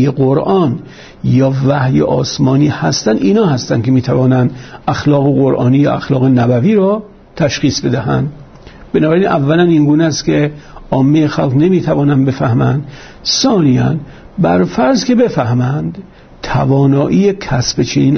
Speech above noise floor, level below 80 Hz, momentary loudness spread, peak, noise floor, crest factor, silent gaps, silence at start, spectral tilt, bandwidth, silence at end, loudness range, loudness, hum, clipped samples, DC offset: 24 dB; -40 dBFS; 8 LU; -2 dBFS; -35 dBFS; 10 dB; none; 0 s; -6.5 dB/octave; 6.6 kHz; 0 s; 2 LU; -12 LUFS; none; under 0.1%; under 0.1%